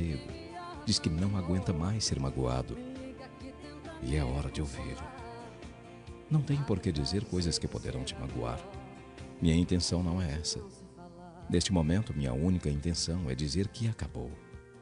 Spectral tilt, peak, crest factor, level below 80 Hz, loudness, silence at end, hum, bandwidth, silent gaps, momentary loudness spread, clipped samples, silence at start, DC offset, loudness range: -5.5 dB/octave; -14 dBFS; 20 dB; -44 dBFS; -33 LUFS; 0 s; none; 10.5 kHz; none; 19 LU; under 0.1%; 0 s; under 0.1%; 5 LU